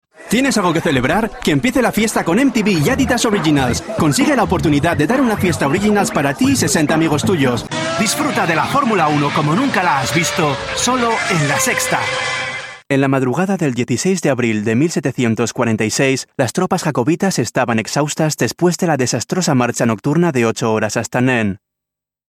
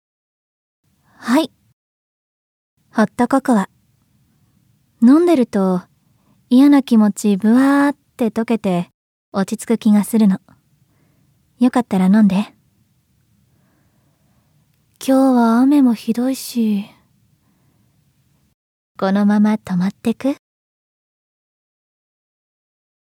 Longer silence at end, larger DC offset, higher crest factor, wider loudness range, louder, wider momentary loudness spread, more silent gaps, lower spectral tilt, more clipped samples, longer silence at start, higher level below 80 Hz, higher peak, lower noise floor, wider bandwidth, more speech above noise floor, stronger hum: second, 0.8 s vs 2.7 s; neither; about the same, 14 dB vs 16 dB; second, 2 LU vs 7 LU; about the same, -16 LUFS vs -16 LUFS; second, 3 LU vs 11 LU; second, none vs 1.73-2.77 s, 8.94-9.32 s, 18.54-18.95 s; second, -4.5 dB/octave vs -6.5 dB/octave; neither; second, 0.2 s vs 1.2 s; first, -42 dBFS vs -64 dBFS; about the same, -2 dBFS vs -2 dBFS; first, -84 dBFS vs -60 dBFS; about the same, 16.5 kHz vs 16.5 kHz; first, 68 dB vs 46 dB; neither